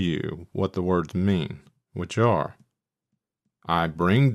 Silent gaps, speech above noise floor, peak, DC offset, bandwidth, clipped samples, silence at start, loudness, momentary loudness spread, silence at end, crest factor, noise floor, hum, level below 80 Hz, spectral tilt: none; 57 dB; -6 dBFS; under 0.1%; 12 kHz; under 0.1%; 0 s; -25 LUFS; 14 LU; 0 s; 18 dB; -81 dBFS; none; -52 dBFS; -7.5 dB/octave